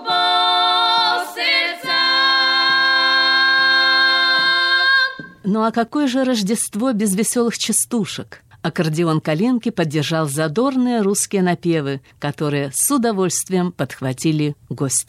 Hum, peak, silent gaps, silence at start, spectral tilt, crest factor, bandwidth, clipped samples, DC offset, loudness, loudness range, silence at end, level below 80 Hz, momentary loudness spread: none; -6 dBFS; none; 0 s; -3 dB/octave; 12 dB; 16 kHz; under 0.1%; under 0.1%; -16 LUFS; 6 LU; 0.05 s; -62 dBFS; 10 LU